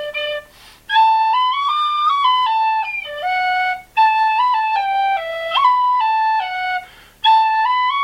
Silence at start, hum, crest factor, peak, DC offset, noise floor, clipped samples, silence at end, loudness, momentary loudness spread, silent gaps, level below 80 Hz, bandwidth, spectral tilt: 0 s; none; 14 dB; -4 dBFS; under 0.1%; -42 dBFS; under 0.1%; 0 s; -16 LUFS; 8 LU; none; -56 dBFS; 14 kHz; 0 dB/octave